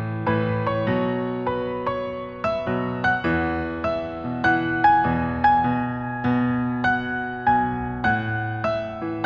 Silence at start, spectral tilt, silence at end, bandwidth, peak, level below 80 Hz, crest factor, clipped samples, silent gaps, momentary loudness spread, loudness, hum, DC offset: 0 s; -8.5 dB/octave; 0 s; 6.6 kHz; -4 dBFS; -44 dBFS; 18 dB; under 0.1%; none; 8 LU; -23 LUFS; none; under 0.1%